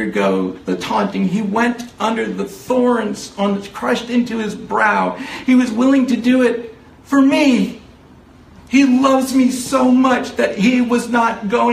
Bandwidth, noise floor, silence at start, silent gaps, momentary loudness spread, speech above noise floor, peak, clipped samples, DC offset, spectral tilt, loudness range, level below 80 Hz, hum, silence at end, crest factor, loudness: 15 kHz; -43 dBFS; 0 s; none; 9 LU; 28 dB; 0 dBFS; under 0.1%; under 0.1%; -5.5 dB/octave; 4 LU; -52 dBFS; none; 0 s; 16 dB; -16 LUFS